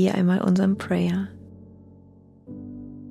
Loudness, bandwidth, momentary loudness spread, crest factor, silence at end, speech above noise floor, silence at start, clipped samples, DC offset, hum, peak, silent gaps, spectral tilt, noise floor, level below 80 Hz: -23 LUFS; 11.5 kHz; 20 LU; 14 dB; 0 s; 30 dB; 0 s; under 0.1%; under 0.1%; none; -10 dBFS; none; -8 dB/octave; -51 dBFS; -58 dBFS